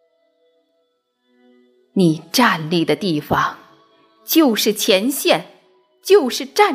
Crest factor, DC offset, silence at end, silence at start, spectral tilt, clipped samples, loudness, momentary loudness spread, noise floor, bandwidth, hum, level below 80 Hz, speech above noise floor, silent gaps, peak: 18 dB; under 0.1%; 0 s; 1.95 s; -4 dB/octave; under 0.1%; -17 LUFS; 6 LU; -67 dBFS; 16 kHz; none; -56 dBFS; 51 dB; none; -2 dBFS